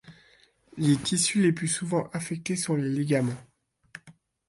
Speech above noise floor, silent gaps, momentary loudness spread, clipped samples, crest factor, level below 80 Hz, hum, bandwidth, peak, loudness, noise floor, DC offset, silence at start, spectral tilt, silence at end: 35 dB; none; 24 LU; under 0.1%; 16 dB; -64 dBFS; none; 11.5 kHz; -12 dBFS; -26 LUFS; -61 dBFS; under 0.1%; 0.05 s; -4.5 dB/octave; 0.4 s